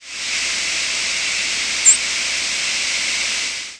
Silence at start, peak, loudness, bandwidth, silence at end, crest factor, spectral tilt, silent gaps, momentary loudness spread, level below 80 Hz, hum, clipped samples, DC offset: 0 s; -2 dBFS; -17 LUFS; 11 kHz; 0 s; 18 dB; 2.5 dB/octave; none; 7 LU; -52 dBFS; none; under 0.1%; under 0.1%